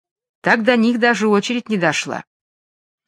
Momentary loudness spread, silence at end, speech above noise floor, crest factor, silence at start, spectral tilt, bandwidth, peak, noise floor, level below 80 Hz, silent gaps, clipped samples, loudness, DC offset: 9 LU; 0.85 s; over 73 dB; 18 dB; 0.45 s; -4.5 dB/octave; 10.5 kHz; 0 dBFS; under -90 dBFS; -68 dBFS; none; under 0.1%; -17 LUFS; under 0.1%